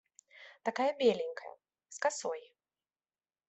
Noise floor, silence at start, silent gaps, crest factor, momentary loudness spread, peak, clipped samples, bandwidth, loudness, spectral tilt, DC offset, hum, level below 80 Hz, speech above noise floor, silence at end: under -90 dBFS; 0.35 s; none; 20 dB; 22 LU; -16 dBFS; under 0.1%; 8.4 kHz; -34 LUFS; -3 dB/octave; under 0.1%; none; -84 dBFS; over 57 dB; 1.1 s